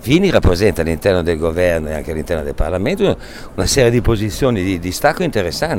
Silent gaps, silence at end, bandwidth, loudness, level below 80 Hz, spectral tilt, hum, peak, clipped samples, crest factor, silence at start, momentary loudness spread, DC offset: none; 0 s; 16.5 kHz; -16 LUFS; -26 dBFS; -5.5 dB/octave; none; 0 dBFS; under 0.1%; 16 dB; 0 s; 8 LU; under 0.1%